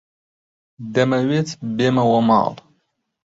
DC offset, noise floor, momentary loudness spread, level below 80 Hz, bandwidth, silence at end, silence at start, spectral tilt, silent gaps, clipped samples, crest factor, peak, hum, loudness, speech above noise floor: under 0.1%; -70 dBFS; 10 LU; -60 dBFS; 7.8 kHz; 0.75 s; 0.8 s; -6.5 dB/octave; none; under 0.1%; 18 dB; -2 dBFS; none; -18 LUFS; 52 dB